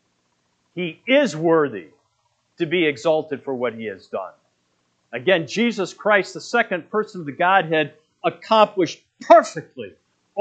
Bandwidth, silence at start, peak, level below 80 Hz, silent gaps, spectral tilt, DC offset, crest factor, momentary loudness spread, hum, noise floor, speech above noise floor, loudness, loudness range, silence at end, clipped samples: 8.8 kHz; 0.75 s; 0 dBFS; -78 dBFS; none; -5 dB/octave; under 0.1%; 22 dB; 17 LU; none; -68 dBFS; 48 dB; -20 LUFS; 5 LU; 0 s; under 0.1%